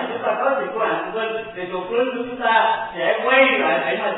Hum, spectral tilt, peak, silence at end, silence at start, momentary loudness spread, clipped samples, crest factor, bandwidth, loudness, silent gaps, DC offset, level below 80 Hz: none; -8.5 dB/octave; -2 dBFS; 0 s; 0 s; 11 LU; under 0.1%; 18 dB; 4.1 kHz; -20 LUFS; none; under 0.1%; -58 dBFS